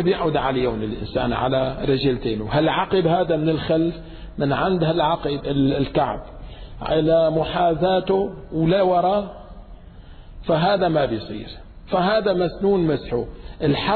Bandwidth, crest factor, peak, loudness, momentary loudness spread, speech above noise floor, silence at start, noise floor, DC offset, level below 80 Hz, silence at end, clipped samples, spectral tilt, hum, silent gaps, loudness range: 4.6 kHz; 14 dB; -8 dBFS; -21 LUFS; 15 LU; 21 dB; 0 s; -41 dBFS; under 0.1%; -40 dBFS; 0 s; under 0.1%; -10 dB/octave; none; none; 2 LU